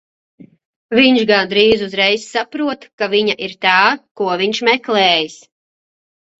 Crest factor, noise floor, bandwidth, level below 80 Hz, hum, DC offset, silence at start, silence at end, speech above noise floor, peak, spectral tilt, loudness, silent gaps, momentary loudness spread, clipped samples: 16 dB; under -90 dBFS; 8 kHz; -56 dBFS; none; under 0.1%; 0.4 s; 1.05 s; over 75 dB; 0 dBFS; -4 dB/octave; -14 LUFS; 0.65-0.89 s, 2.93-2.98 s, 4.11-4.15 s; 10 LU; under 0.1%